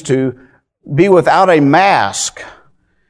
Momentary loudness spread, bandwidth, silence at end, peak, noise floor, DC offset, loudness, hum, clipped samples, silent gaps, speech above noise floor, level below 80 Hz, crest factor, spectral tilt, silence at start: 11 LU; 11 kHz; 0.6 s; 0 dBFS; -53 dBFS; under 0.1%; -11 LUFS; none; 0.2%; none; 42 dB; -50 dBFS; 12 dB; -5 dB/octave; 0.05 s